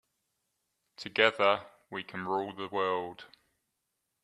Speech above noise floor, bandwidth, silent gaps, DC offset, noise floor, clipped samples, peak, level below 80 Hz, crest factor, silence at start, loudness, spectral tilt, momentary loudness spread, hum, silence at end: 52 dB; 11.5 kHz; none; under 0.1%; -83 dBFS; under 0.1%; -8 dBFS; -78 dBFS; 26 dB; 1 s; -30 LUFS; -4.5 dB/octave; 18 LU; none; 1 s